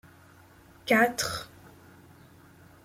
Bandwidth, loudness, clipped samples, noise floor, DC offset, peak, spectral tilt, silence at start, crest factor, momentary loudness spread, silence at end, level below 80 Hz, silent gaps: 16.5 kHz; -26 LUFS; under 0.1%; -55 dBFS; under 0.1%; -10 dBFS; -3 dB/octave; 0.85 s; 22 dB; 19 LU; 1.4 s; -62 dBFS; none